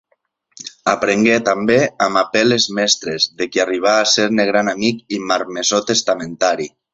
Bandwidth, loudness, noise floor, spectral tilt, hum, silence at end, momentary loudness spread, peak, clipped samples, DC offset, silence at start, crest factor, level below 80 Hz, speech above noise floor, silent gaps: 8.2 kHz; -16 LUFS; -65 dBFS; -3 dB/octave; none; 0.25 s; 6 LU; -2 dBFS; under 0.1%; under 0.1%; 0.65 s; 16 dB; -56 dBFS; 49 dB; none